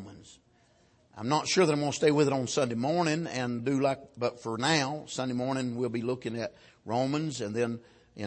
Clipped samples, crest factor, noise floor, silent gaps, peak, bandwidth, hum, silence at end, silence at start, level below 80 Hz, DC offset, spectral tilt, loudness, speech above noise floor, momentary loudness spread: under 0.1%; 20 dB; -65 dBFS; none; -10 dBFS; 8.8 kHz; none; 0 s; 0 s; -68 dBFS; under 0.1%; -5 dB/octave; -30 LUFS; 35 dB; 9 LU